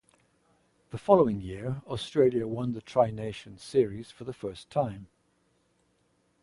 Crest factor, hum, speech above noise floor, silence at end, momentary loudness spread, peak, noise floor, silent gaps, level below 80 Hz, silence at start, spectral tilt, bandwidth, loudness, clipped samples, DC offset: 24 dB; none; 42 dB; 1.4 s; 17 LU; -6 dBFS; -71 dBFS; none; -58 dBFS; 0.95 s; -7.5 dB/octave; 11.5 kHz; -29 LUFS; under 0.1%; under 0.1%